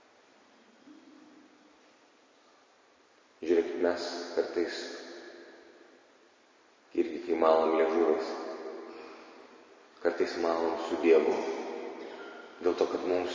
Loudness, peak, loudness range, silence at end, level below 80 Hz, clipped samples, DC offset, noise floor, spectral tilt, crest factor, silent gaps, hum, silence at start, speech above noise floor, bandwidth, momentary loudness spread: -30 LUFS; -10 dBFS; 6 LU; 0 s; -72 dBFS; under 0.1%; under 0.1%; -63 dBFS; -4 dB/octave; 22 dB; none; none; 0.85 s; 35 dB; 7.6 kHz; 21 LU